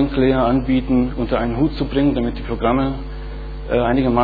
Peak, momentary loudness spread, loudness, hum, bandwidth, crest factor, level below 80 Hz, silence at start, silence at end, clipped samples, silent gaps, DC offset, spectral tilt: -2 dBFS; 13 LU; -19 LUFS; none; 4.9 kHz; 16 dB; -28 dBFS; 0 s; 0 s; under 0.1%; none; under 0.1%; -10.5 dB/octave